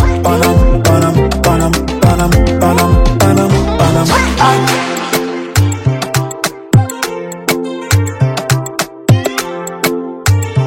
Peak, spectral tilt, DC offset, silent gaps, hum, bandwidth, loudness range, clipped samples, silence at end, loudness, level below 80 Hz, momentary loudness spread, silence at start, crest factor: 0 dBFS; -5.5 dB/octave; under 0.1%; none; none; 17 kHz; 4 LU; 0.3%; 0 s; -12 LUFS; -20 dBFS; 7 LU; 0 s; 12 dB